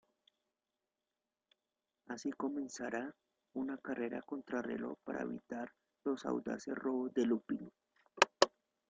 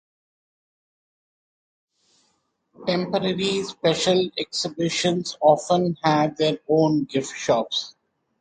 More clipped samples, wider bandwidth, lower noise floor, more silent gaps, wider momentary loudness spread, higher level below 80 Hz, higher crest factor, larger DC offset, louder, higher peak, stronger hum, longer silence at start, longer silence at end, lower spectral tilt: neither; about the same, 9 kHz vs 9.6 kHz; first, under -90 dBFS vs -70 dBFS; neither; first, 12 LU vs 7 LU; second, -80 dBFS vs -62 dBFS; first, 32 dB vs 20 dB; neither; second, -39 LUFS vs -22 LUFS; second, -8 dBFS vs -4 dBFS; neither; second, 2.1 s vs 2.8 s; about the same, 0.4 s vs 0.5 s; about the same, -3.5 dB/octave vs -4.5 dB/octave